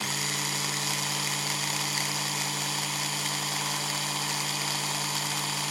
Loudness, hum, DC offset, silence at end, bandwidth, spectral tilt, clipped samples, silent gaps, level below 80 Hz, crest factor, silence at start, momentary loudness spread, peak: -27 LUFS; none; under 0.1%; 0 s; 16.5 kHz; -1.5 dB/octave; under 0.1%; none; -72 dBFS; 16 dB; 0 s; 1 LU; -12 dBFS